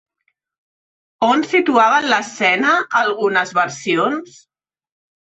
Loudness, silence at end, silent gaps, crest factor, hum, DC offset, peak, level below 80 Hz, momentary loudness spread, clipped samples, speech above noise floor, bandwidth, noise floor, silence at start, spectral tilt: -16 LUFS; 0.95 s; none; 16 dB; none; under 0.1%; -2 dBFS; -66 dBFS; 6 LU; under 0.1%; 54 dB; 8.4 kHz; -70 dBFS; 1.2 s; -3.5 dB/octave